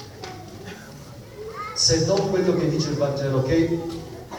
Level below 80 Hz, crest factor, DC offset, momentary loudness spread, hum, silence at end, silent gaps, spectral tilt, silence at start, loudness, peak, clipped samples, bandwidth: -46 dBFS; 18 dB; under 0.1%; 20 LU; none; 0 s; none; -4.5 dB/octave; 0 s; -22 LUFS; -6 dBFS; under 0.1%; 19 kHz